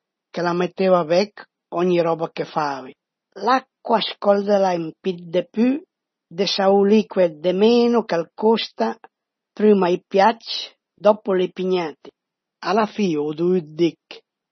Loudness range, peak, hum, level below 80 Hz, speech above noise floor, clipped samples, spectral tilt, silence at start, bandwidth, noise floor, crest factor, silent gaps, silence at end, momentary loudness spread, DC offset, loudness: 3 LU; 0 dBFS; none; -72 dBFS; 30 dB; under 0.1%; -6 dB/octave; 0.35 s; 6.4 kHz; -49 dBFS; 20 dB; none; 0.35 s; 11 LU; under 0.1%; -20 LUFS